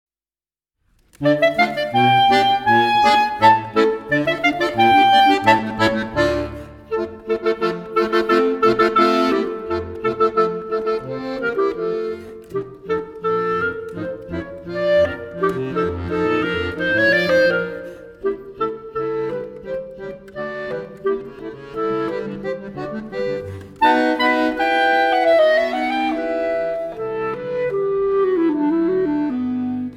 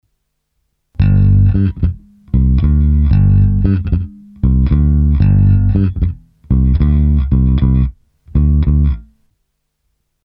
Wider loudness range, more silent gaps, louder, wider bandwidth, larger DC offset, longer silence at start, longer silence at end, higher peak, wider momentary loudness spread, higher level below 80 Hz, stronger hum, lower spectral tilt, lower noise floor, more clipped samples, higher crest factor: first, 11 LU vs 2 LU; neither; second, -19 LUFS vs -13 LUFS; first, 16 kHz vs 4.2 kHz; neither; first, 1.2 s vs 1 s; second, 0 s vs 1.25 s; about the same, 0 dBFS vs 0 dBFS; first, 14 LU vs 9 LU; second, -48 dBFS vs -16 dBFS; neither; second, -5.5 dB/octave vs -12.5 dB/octave; first, under -90 dBFS vs -68 dBFS; neither; first, 18 dB vs 12 dB